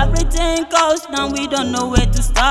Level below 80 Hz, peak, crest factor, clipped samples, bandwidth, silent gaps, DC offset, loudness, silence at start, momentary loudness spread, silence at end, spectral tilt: -20 dBFS; 0 dBFS; 16 dB; under 0.1%; 13 kHz; none; under 0.1%; -17 LUFS; 0 s; 4 LU; 0 s; -4 dB/octave